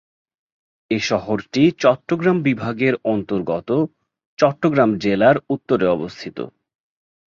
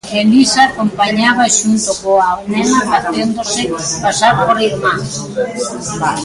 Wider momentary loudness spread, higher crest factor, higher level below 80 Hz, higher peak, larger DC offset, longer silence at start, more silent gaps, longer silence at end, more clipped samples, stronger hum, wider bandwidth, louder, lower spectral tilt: about the same, 10 LU vs 9 LU; about the same, 18 dB vs 14 dB; second, -56 dBFS vs -46 dBFS; about the same, -2 dBFS vs 0 dBFS; neither; first, 0.9 s vs 0.05 s; first, 4.26-4.37 s vs none; first, 0.8 s vs 0 s; neither; neither; second, 7.4 kHz vs 11.5 kHz; second, -19 LUFS vs -13 LUFS; first, -6.5 dB/octave vs -3 dB/octave